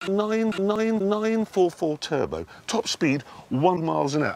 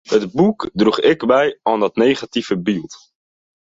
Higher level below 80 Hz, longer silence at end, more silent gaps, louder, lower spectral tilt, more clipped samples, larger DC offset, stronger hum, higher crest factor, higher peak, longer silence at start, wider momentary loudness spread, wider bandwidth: about the same, -58 dBFS vs -54 dBFS; second, 0 s vs 0.8 s; neither; second, -25 LUFS vs -17 LUFS; about the same, -5.5 dB/octave vs -6 dB/octave; neither; neither; neither; about the same, 18 dB vs 16 dB; second, -6 dBFS vs -2 dBFS; about the same, 0 s vs 0.1 s; about the same, 6 LU vs 7 LU; first, 14.5 kHz vs 7.8 kHz